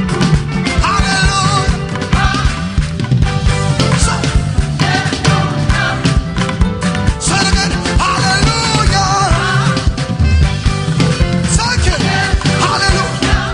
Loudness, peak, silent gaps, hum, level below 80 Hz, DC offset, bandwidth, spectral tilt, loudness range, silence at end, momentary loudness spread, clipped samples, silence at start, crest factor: -13 LUFS; -2 dBFS; none; none; -18 dBFS; under 0.1%; 10.5 kHz; -4.5 dB/octave; 2 LU; 0 s; 4 LU; under 0.1%; 0 s; 10 dB